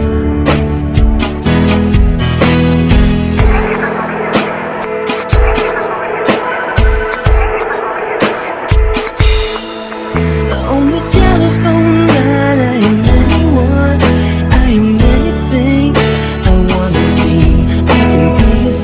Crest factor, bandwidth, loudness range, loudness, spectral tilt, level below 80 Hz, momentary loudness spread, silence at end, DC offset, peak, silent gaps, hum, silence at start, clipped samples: 10 dB; 4 kHz; 4 LU; -11 LUFS; -11 dB/octave; -14 dBFS; 6 LU; 0 s; under 0.1%; 0 dBFS; none; none; 0 s; 0.6%